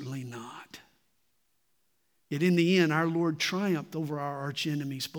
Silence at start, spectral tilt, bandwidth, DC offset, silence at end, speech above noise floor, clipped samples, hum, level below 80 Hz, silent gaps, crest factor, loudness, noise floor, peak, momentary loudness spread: 0 s; -5.5 dB/octave; 19 kHz; under 0.1%; 0 s; 48 dB; under 0.1%; none; -82 dBFS; none; 18 dB; -29 LUFS; -76 dBFS; -12 dBFS; 18 LU